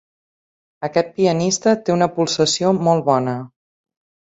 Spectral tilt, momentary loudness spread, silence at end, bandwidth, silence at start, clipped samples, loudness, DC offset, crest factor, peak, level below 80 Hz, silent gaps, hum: -4.5 dB/octave; 6 LU; 0.9 s; 8.4 kHz; 0.8 s; under 0.1%; -18 LUFS; under 0.1%; 18 dB; -2 dBFS; -60 dBFS; none; none